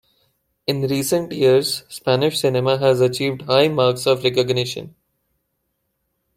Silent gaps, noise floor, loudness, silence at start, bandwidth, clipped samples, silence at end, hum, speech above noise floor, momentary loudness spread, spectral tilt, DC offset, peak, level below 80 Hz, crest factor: none; -73 dBFS; -19 LUFS; 0.7 s; 16 kHz; under 0.1%; 1.5 s; none; 55 dB; 8 LU; -5 dB/octave; under 0.1%; -2 dBFS; -60 dBFS; 18 dB